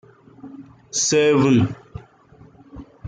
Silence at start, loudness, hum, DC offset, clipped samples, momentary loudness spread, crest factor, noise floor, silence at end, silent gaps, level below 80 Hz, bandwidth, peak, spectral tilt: 0.45 s; -18 LUFS; none; under 0.1%; under 0.1%; 25 LU; 16 dB; -49 dBFS; 0 s; none; -52 dBFS; 9.6 kHz; -6 dBFS; -4.5 dB/octave